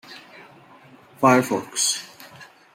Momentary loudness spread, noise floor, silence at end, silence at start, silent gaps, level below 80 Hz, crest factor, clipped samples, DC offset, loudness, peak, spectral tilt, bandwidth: 25 LU; -49 dBFS; 0.3 s; 0.1 s; none; -70 dBFS; 22 dB; under 0.1%; under 0.1%; -20 LUFS; -2 dBFS; -3 dB/octave; 16.5 kHz